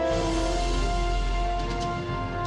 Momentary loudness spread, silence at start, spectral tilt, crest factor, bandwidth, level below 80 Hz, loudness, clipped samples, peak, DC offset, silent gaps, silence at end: 4 LU; 0 s; -5.5 dB/octave; 10 dB; 11 kHz; -28 dBFS; -28 LUFS; under 0.1%; -16 dBFS; under 0.1%; none; 0 s